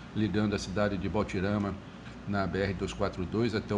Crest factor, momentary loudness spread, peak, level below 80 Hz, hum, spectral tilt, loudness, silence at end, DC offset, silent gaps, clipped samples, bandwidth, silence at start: 18 dB; 6 LU; -14 dBFS; -48 dBFS; none; -6.5 dB/octave; -31 LUFS; 0 s; under 0.1%; none; under 0.1%; 10 kHz; 0 s